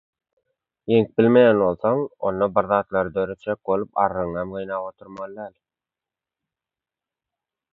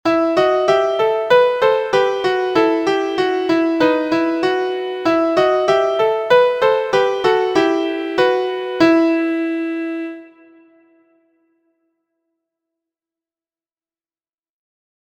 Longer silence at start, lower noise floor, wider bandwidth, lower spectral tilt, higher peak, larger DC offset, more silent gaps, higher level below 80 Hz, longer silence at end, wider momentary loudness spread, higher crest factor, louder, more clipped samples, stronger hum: first, 0.85 s vs 0.05 s; about the same, -89 dBFS vs under -90 dBFS; second, 4.2 kHz vs 9.2 kHz; first, -9.5 dB/octave vs -5 dB/octave; second, -4 dBFS vs 0 dBFS; neither; neither; about the same, -56 dBFS vs -58 dBFS; second, 2.25 s vs 4.8 s; first, 19 LU vs 7 LU; about the same, 20 dB vs 18 dB; second, -21 LUFS vs -16 LUFS; neither; neither